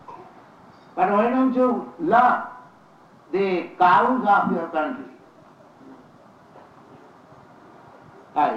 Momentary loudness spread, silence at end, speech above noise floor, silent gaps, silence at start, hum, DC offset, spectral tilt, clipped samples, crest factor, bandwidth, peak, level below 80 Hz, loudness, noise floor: 19 LU; 0 s; 31 dB; none; 0.1 s; none; under 0.1%; -7.5 dB/octave; under 0.1%; 18 dB; 7.6 kHz; -6 dBFS; -68 dBFS; -21 LUFS; -51 dBFS